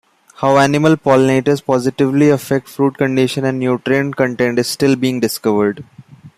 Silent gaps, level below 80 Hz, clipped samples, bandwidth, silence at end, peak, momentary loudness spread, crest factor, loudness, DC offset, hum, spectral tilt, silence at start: none; -54 dBFS; under 0.1%; 15.5 kHz; 0.1 s; 0 dBFS; 6 LU; 14 dB; -15 LUFS; under 0.1%; none; -6 dB/octave; 0.4 s